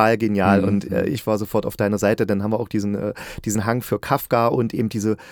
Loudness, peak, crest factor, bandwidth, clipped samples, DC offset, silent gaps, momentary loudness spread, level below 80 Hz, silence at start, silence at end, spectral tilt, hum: -21 LUFS; -2 dBFS; 20 dB; over 20 kHz; under 0.1%; under 0.1%; none; 7 LU; -50 dBFS; 0 s; 0 s; -6.5 dB/octave; none